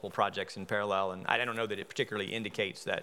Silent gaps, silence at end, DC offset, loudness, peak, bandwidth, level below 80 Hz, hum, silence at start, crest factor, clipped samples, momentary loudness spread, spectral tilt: none; 0 s; under 0.1%; -33 LUFS; -10 dBFS; 17 kHz; -84 dBFS; none; 0.05 s; 24 dB; under 0.1%; 5 LU; -4 dB/octave